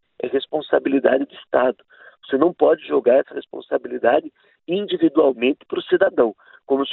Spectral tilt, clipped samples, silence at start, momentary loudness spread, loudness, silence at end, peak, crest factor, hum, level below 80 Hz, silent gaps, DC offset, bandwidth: -9.5 dB/octave; under 0.1%; 0.2 s; 9 LU; -20 LUFS; 0 s; -2 dBFS; 18 dB; none; -64 dBFS; none; under 0.1%; 4.2 kHz